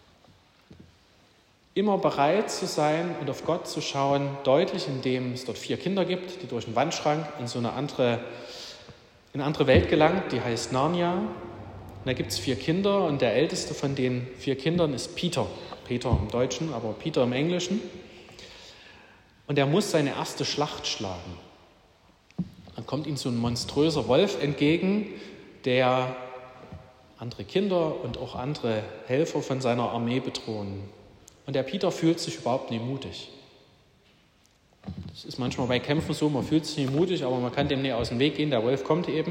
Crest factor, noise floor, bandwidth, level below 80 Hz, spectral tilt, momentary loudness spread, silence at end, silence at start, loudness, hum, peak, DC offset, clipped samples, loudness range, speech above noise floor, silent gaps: 20 dB; -62 dBFS; 16 kHz; -54 dBFS; -5.5 dB/octave; 17 LU; 0 s; 0.7 s; -27 LUFS; none; -6 dBFS; under 0.1%; under 0.1%; 5 LU; 35 dB; none